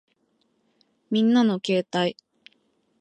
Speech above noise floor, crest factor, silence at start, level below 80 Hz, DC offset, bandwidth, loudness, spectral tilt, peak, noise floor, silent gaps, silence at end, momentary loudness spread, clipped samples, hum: 48 dB; 16 dB; 1.1 s; -76 dBFS; under 0.1%; 8.8 kHz; -23 LUFS; -6 dB/octave; -10 dBFS; -69 dBFS; none; 0.9 s; 8 LU; under 0.1%; none